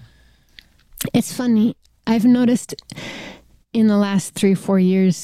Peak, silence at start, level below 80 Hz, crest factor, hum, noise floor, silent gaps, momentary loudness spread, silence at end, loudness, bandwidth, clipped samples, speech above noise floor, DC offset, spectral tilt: -6 dBFS; 1 s; -56 dBFS; 12 dB; none; -53 dBFS; none; 17 LU; 0 s; -18 LUFS; 16 kHz; under 0.1%; 37 dB; 0.1%; -6 dB/octave